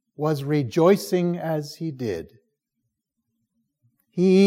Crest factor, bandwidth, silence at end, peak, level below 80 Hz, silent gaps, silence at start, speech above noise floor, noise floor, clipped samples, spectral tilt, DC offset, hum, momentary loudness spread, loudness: 18 dB; 16 kHz; 0 s; -6 dBFS; -68 dBFS; none; 0.2 s; 58 dB; -79 dBFS; under 0.1%; -7 dB/octave; under 0.1%; none; 13 LU; -23 LUFS